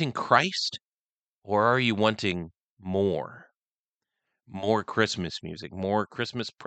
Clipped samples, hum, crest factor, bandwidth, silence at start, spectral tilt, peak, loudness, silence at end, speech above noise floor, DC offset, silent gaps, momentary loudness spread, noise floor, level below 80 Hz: under 0.1%; none; 24 dB; 9 kHz; 0 s; -5 dB/octave; -4 dBFS; -27 LUFS; 0 s; over 63 dB; under 0.1%; 0.89-1.42 s, 2.63-2.77 s, 3.55-4.01 s; 16 LU; under -90 dBFS; -64 dBFS